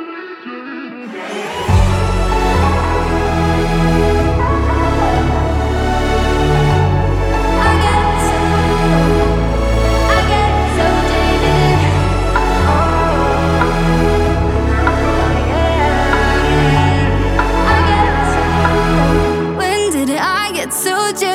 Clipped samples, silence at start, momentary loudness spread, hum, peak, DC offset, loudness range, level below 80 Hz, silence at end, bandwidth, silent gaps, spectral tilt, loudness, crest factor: under 0.1%; 0 s; 4 LU; none; 0 dBFS; under 0.1%; 1 LU; -20 dBFS; 0 s; 15.5 kHz; none; -5.5 dB/octave; -14 LUFS; 12 dB